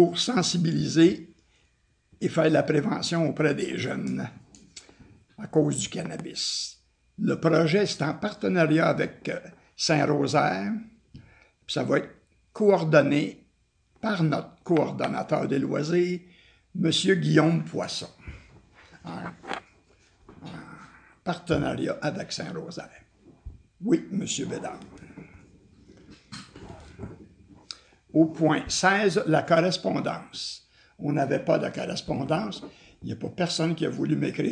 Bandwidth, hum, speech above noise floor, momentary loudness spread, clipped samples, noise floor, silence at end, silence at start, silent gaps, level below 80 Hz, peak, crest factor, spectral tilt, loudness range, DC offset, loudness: 10 kHz; none; 42 dB; 21 LU; under 0.1%; -67 dBFS; 0 s; 0 s; none; -58 dBFS; -4 dBFS; 22 dB; -5 dB/octave; 8 LU; under 0.1%; -26 LUFS